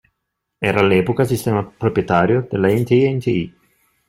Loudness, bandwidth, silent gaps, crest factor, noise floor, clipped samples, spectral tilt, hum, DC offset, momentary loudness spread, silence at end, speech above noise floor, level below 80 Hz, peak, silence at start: -17 LUFS; 16 kHz; none; 16 dB; -77 dBFS; under 0.1%; -7 dB/octave; none; under 0.1%; 6 LU; 0.6 s; 60 dB; -50 dBFS; -2 dBFS; 0.6 s